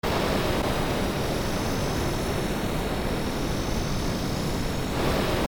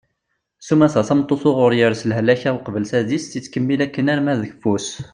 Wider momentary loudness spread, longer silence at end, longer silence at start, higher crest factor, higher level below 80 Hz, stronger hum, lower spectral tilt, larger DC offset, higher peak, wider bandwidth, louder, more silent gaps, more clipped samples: second, 3 LU vs 8 LU; about the same, 0.05 s vs 0.05 s; second, 0.05 s vs 0.6 s; about the same, 14 dB vs 16 dB; first, -34 dBFS vs -58 dBFS; neither; about the same, -5 dB/octave vs -6 dB/octave; first, 0.2% vs under 0.1%; second, -12 dBFS vs -2 dBFS; first, over 20 kHz vs 10.5 kHz; second, -27 LUFS vs -18 LUFS; neither; neither